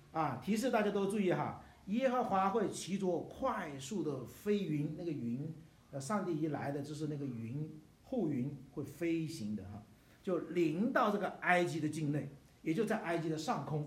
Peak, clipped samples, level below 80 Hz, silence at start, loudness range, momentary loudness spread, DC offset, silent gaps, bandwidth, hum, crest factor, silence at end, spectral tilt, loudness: -16 dBFS; under 0.1%; -70 dBFS; 0 s; 6 LU; 12 LU; under 0.1%; none; 16 kHz; none; 22 dB; 0 s; -6 dB/octave; -37 LUFS